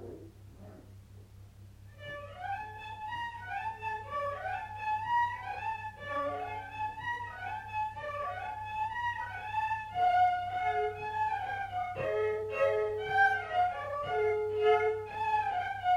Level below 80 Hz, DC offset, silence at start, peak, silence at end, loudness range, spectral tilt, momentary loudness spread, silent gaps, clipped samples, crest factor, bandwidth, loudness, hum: -60 dBFS; under 0.1%; 0 s; -16 dBFS; 0 s; 10 LU; -5 dB/octave; 13 LU; none; under 0.1%; 18 dB; 14 kHz; -33 LUFS; none